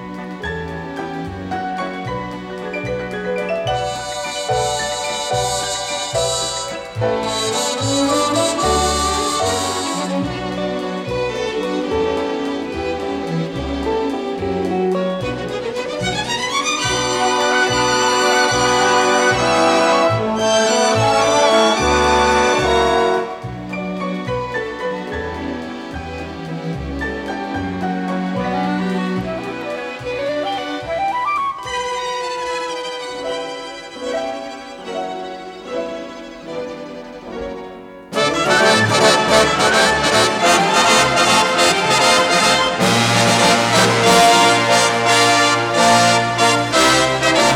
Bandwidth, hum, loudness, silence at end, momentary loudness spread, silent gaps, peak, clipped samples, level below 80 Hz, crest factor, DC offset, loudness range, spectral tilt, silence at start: 18 kHz; none; -16 LUFS; 0 s; 15 LU; none; 0 dBFS; under 0.1%; -40 dBFS; 18 dB; under 0.1%; 12 LU; -3 dB/octave; 0 s